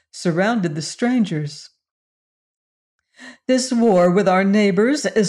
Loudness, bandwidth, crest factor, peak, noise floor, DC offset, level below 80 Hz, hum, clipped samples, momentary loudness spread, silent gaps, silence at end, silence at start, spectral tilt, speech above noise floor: -18 LUFS; 11.5 kHz; 12 dB; -6 dBFS; under -90 dBFS; under 0.1%; -64 dBFS; none; under 0.1%; 11 LU; 1.91-2.99 s; 0 s; 0.15 s; -5.5 dB/octave; over 73 dB